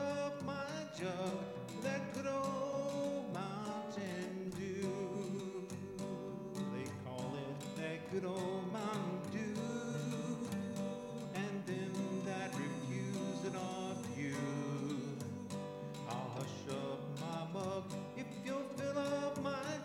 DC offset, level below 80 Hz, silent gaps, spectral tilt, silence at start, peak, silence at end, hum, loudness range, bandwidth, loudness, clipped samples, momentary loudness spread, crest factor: under 0.1%; -78 dBFS; none; -6 dB/octave; 0 s; -28 dBFS; 0 s; none; 2 LU; 16.5 kHz; -42 LUFS; under 0.1%; 5 LU; 14 dB